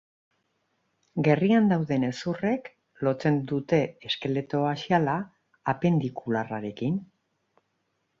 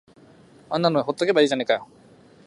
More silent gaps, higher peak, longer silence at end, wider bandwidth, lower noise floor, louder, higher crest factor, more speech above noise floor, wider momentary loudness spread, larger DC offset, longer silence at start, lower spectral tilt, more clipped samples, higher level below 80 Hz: neither; second, -8 dBFS vs -4 dBFS; first, 1.15 s vs 0.65 s; second, 7.4 kHz vs 11.5 kHz; first, -76 dBFS vs -51 dBFS; second, -27 LUFS vs -22 LUFS; about the same, 20 dB vs 20 dB; first, 50 dB vs 30 dB; first, 10 LU vs 6 LU; neither; first, 1.15 s vs 0.7 s; first, -7.5 dB/octave vs -5 dB/octave; neither; first, -64 dBFS vs -70 dBFS